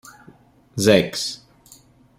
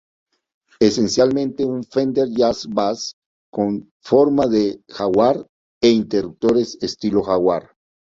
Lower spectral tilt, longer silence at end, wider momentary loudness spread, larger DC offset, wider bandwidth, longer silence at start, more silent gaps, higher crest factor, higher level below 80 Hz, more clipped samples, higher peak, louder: about the same, -4.5 dB/octave vs -5.5 dB/octave; first, 0.85 s vs 0.6 s; first, 18 LU vs 9 LU; neither; first, 16 kHz vs 7.8 kHz; about the same, 0.75 s vs 0.8 s; second, none vs 3.13-3.53 s, 3.91-4.00 s, 5.49-5.81 s; about the same, 22 dB vs 18 dB; about the same, -56 dBFS vs -54 dBFS; neither; about the same, -2 dBFS vs -2 dBFS; about the same, -19 LUFS vs -19 LUFS